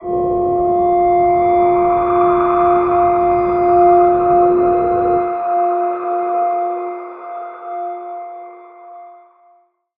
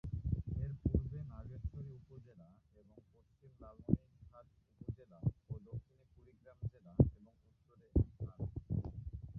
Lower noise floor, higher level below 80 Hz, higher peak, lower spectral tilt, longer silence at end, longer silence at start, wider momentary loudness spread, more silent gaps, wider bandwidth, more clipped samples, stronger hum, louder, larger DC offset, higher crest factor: second, -54 dBFS vs -70 dBFS; about the same, -44 dBFS vs -48 dBFS; first, -2 dBFS vs -14 dBFS; second, -11 dB/octave vs -13.5 dB/octave; first, 0.9 s vs 0 s; about the same, 0 s vs 0.05 s; second, 16 LU vs 23 LU; neither; first, 3.7 kHz vs 1.9 kHz; neither; neither; first, -14 LUFS vs -41 LUFS; neither; second, 14 dB vs 26 dB